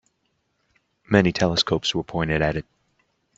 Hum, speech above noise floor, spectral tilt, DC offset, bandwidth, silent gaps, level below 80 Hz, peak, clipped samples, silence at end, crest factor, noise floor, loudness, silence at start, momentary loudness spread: none; 50 dB; -5 dB/octave; under 0.1%; 8 kHz; none; -46 dBFS; -2 dBFS; under 0.1%; 0.75 s; 22 dB; -72 dBFS; -22 LUFS; 1.1 s; 6 LU